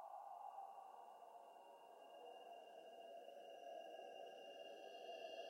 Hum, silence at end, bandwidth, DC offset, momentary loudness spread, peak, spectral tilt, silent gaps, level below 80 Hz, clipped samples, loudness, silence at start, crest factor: none; 0 s; 16 kHz; under 0.1%; 7 LU; -42 dBFS; -1.5 dB/octave; none; under -90 dBFS; under 0.1%; -58 LUFS; 0 s; 16 dB